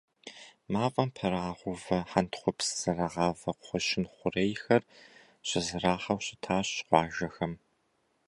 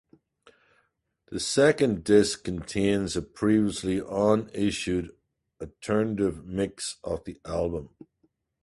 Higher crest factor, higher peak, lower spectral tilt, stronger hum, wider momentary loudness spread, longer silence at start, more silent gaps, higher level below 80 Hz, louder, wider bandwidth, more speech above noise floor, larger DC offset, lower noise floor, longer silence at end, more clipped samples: about the same, 24 dB vs 20 dB; about the same, -8 dBFS vs -6 dBFS; about the same, -4.5 dB/octave vs -5 dB/octave; neither; second, 10 LU vs 13 LU; second, 0.25 s vs 1.3 s; neither; second, -58 dBFS vs -50 dBFS; second, -31 LUFS vs -26 LUFS; about the same, 11.5 kHz vs 11.5 kHz; about the same, 43 dB vs 46 dB; neither; about the same, -74 dBFS vs -72 dBFS; about the same, 0.7 s vs 0.8 s; neither